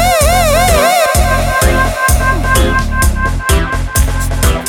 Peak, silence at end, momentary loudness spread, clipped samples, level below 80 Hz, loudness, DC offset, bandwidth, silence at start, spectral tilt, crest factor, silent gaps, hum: 0 dBFS; 0 s; 5 LU; under 0.1%; -14 dBFS; -11 LUFS; under 0.1%; 18 kHz; 0 s; -4 dB/octave; 10 dB; none; none